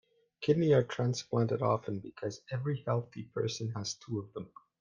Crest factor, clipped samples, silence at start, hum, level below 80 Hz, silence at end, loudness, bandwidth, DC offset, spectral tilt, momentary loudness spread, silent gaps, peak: 18 dB; under 0.1%; 0.4 s; none; -70 dBFS; 0.35 s; -33 LUFS; 9 kHz; under 0.1%; -6 dB/octave; 13 LU; none; -16 dBFS